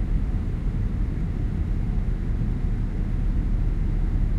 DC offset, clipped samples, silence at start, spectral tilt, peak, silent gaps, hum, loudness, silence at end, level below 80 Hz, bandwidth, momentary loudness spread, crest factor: under 0.1%; under 0.1%; 0 s; -9.5 dB/octave; -12 dBFS; none; none; -28 LUFS; 0 s; -24 dBFS; 4.1 kHz; 2 LU; 10 dB